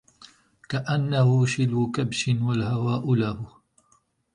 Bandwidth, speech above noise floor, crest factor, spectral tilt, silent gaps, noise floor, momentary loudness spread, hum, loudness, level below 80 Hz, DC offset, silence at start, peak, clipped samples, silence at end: 10.5 kHz; 42 dB; 14 dB; -6.5 dB/octave; none; -65 dBFS; 10 LU; none; -24 LUFS; -56 dBFS; under 0.1%; 0.2 s; -10 dBFS; under 0.1%; 0.9 s